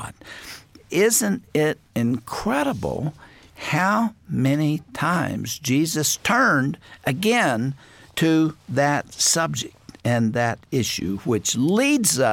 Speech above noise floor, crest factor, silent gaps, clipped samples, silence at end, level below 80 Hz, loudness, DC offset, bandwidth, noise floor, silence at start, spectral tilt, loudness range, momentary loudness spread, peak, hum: 21 dB; 16 dB; none; under 0.1%; 0 s; -54 dBFS; -22 LUFS; under 0.1%; 17 kHz; -42 dBFS; 0 s; -4 dB/octave; 3 LU; 11 LU; -6 dBFS; none